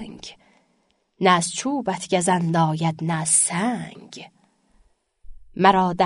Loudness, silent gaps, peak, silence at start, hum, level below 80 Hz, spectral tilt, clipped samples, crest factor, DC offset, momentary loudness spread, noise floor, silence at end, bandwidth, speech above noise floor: -20 LUFS; none; -2 dBFS; 0 s; none; -54 dBFS; -4 dB/octave; under 0.1%; 20 dB; under 0.1%; 22 LU; -67 dBFS; 0 s; 11 kHz; 46 dB